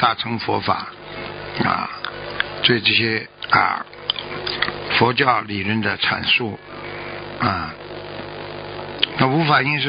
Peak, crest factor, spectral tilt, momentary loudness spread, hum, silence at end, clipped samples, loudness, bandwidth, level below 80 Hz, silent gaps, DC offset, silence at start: 0 dBFS; 20 dB; -9.5 dB/octave; 16 LU; none; 0 s; under 0.1%; -20 LUFS; 5.4 kHz; -50 dBFS; none; under 0.1%; 0 s